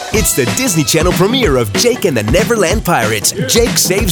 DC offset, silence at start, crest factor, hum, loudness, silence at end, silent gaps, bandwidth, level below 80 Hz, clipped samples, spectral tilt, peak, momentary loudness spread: under 0.1%; 0 s; 12 dB; none; -12 LUFS; 0 s; none; over 20 kHz; -26 dBFS; under 0.1%; -3.5 dB/octave; 0 dBFS; 2 LU